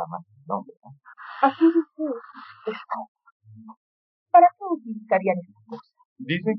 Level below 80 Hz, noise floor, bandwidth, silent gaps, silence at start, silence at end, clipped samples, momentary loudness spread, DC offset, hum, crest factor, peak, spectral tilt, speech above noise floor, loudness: -84 dBFS; -43 dBFS; 5.4 kHz; 0.77-0.81 s, 3.08-3.15 s, 3.32-3.40 s, 3.77-4.26 s, 6.05-6.16 s; 0 s; 0 s; under 0.1%; 25 LU; under 0.1%; none; 20 dB; -4 dBFS; -5 dB/octave; 20 dB; -23 LUFS